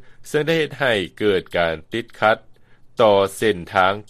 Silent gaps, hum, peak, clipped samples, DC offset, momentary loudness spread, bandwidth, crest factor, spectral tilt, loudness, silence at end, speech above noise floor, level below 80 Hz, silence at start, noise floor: none; none; 0 dBFS; under 0.1%; under 0.1%; 9 LU; 15 kHz; 20 dB; -5 dB/octave; -20 LUFS; 0.1 s; 27 dB; -52 dBFS; 0 s; -46 dBFS